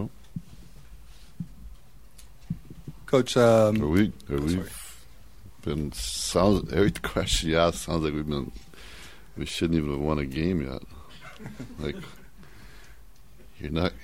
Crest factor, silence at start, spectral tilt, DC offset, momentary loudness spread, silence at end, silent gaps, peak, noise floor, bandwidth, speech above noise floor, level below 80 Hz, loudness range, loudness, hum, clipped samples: 20 dB; 0 s; -5.5 dB/octave; 0.5%; 22 LU; 0 s; none; -8 dBFS; -53 dBFS; 16 kHz; 27 dB; -42 dBFS; 9 LU; -26 LUFS; none; under 0.1%